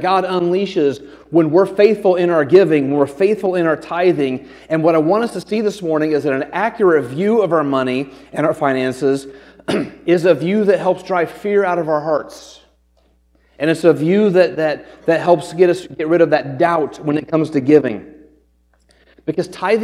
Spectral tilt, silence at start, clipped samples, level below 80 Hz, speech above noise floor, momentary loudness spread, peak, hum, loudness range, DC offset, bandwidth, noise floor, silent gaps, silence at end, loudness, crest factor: -7 dB/octave; 0 s; under 0.1%; -56 dBFS; 42 dB; 8 LU; 0 dBFS; none; 4 LU; under 0.1%; 12.5 kHz; -57 dBFS; none; 0 s; -16 LUFS; 16 dB